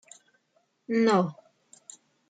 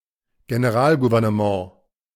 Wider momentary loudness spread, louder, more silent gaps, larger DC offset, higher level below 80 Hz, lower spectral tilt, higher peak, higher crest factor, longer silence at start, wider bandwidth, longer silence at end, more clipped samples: first, 25 LU vs 10 LU; second, -26 LUFS vs -20 LUFS; neither; neither; second, -80 dBFS vs -56 dBFS; second, -6 dB/octave vs -7.5 dB/octave; second, -12 dBFS vs -6 dBFS; about the same, 18 dB vs 16 dB; first, 0.9 s vs 0.5 s; second, 9.4 kHz vs 15 kHz; first, 0.95 s vs 0.45 s; neither